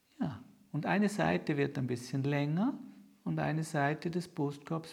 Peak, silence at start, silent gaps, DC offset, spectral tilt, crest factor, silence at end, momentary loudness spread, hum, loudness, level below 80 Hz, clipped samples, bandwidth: -14 dBFS; 0.2 s; none; under 0.1%; -7 dB/octave; 20 dB; 0 s; 10 LU; none; -34 LUFS; -70 dBFS; under 0.1%; 14 kHz